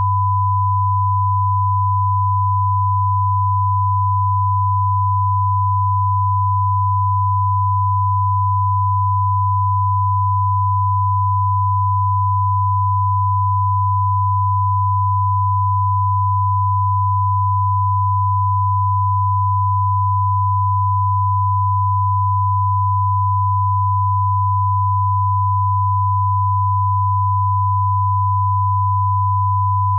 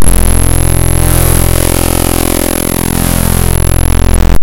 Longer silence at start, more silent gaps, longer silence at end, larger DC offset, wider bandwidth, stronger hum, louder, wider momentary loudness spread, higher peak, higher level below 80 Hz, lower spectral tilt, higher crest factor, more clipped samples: about the same, 0 s vs 0 s; neither; about the same, 0 s vs 0 s; second, under 0.1% vs 20%; second, 1.1 kHz vs 17.5 kHz; neither; second, -17 LUFS vs -10 LUFS; about the same, 0 LU vs 2 LU; second, -10 dBFS vs 0 dBFS; second, -52 dBFS vs -12 dBFS; first, -15 dB/octave vs -4.5 dB/octave; about the same, 6 dB vs 10 dB; second, under 0.1% vs 4%